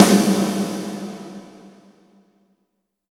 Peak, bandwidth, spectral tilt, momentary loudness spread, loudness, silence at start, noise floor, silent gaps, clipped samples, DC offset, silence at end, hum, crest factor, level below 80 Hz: 0 dBFS; 17 kHz; -5 dB/octave; 22 LU; -20 LUFS; 0 s; -73 dBFS; none; under 0.1%; under 0.1%; 1.45 s; none; 22 dB; -62 dBFS